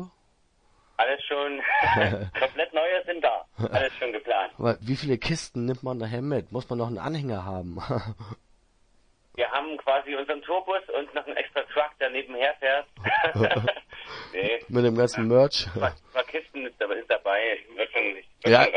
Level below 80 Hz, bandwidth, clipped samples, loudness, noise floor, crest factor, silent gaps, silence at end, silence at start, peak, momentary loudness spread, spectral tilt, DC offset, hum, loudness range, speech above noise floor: -56 dBFS; 10 kHz; under 0.1%; -26 LUFS; -65 dBFS; 24 dB; none; 0 s; 0 s; -4 dBFS; 10 LU; -5.5 dB/octave; under 0.1%; none; 7 LU; 39 dB